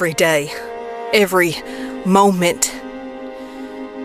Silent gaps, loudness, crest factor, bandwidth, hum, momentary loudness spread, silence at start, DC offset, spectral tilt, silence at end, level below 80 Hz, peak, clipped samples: none; -17 LUFS; 18 dB; 15.5 kHz; none; 18 LU; 0 s; under 0.1%; -4 dB/octave; 0 s; -52 dBFS; 0 dBFS; under 0.1%